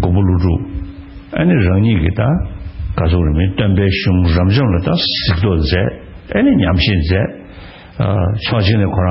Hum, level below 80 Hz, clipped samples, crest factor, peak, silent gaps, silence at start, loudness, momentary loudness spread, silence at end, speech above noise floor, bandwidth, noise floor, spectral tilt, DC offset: none; -26 dBFS; under 0.1%; 14 dB; 0 dBFS; none; 0 s; -14 LUFS; 14 LU; 0 s; 22 dB; 5.8 kHz; -35 dBFS; -11.5 dB/octave; under 0.1%